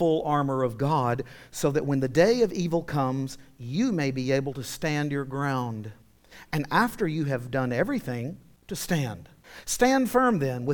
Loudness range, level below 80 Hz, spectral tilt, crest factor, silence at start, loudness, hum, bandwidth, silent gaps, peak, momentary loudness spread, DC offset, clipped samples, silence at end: 3 LU; -54 dBFS; -5.5 dB/octave; 18 dB; 0 s; -26 LUFS; none; 19 kHz; none; -8 dBFS; 13 LU; under 0.1%; under 0.1%; 0 s